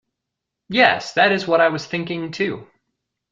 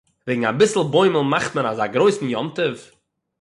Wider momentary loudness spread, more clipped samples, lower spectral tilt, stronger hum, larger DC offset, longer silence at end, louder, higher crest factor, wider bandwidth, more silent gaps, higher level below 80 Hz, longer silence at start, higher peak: about the same, 10 LU vs 8 LU; neither; about the same, -4.5 dB/octave vs -5 dB/octave; neither; neither; first, 0.7 s vs 0.55 s; about the same, -19 LUFS vs -19 LUFS; about the same, 20 dB vs 16 dB; second, 7.8 kHz vs 11.5 kHz; neither; about the same, -64 dBFS vs -62 dBFS; first, 0.7 s vs 0.25 s; first, 0 dBFS vs -4 dBFS